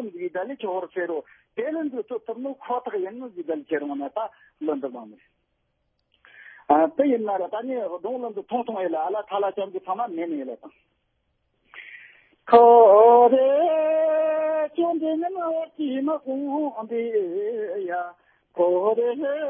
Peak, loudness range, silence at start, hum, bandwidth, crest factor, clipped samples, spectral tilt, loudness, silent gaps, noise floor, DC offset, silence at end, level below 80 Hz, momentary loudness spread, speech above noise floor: -4 dBFS; 13 LU; 0 s; none; 4.3 kHz; 20 dB; under 0.1%; -9.5 dB/octave; -23 LUFS; none; -73 dBFS; under 0.1%; 0 s; -74 dBFS; 17 LU; 51 dB